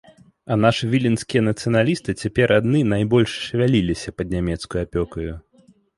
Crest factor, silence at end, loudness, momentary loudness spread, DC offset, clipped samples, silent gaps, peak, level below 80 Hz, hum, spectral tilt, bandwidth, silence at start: 18 dB; 0.6 s; -20 LUFS; 9 LU; under 0.1%; under 0.1%; none; -2 dBFS; -40 dBFS; none; -6.5 dB/octave; 11.5 kHz; 0.45 s